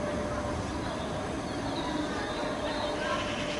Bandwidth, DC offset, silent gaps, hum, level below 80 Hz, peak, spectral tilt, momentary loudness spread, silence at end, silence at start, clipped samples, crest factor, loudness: 11.5 kHz; under 0.1%; none; none; -48 dBFS; -18 dBFS; -5 dB/octave; 3 LU; 0 s; 0 s; under 0.1%; 16 dB; -33 LUFS